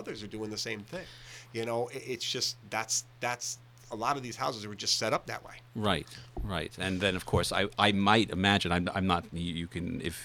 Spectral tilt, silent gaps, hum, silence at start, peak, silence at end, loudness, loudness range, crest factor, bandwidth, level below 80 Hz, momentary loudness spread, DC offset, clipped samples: -3.5 dB/octave; none; none; 0 s; -6 dBFS; 0 s; -31 LUFS; 6 LU; 26 dB; 18.5 kHz; -52 dBFS; 15 LU; under 0.1%; under 0.1%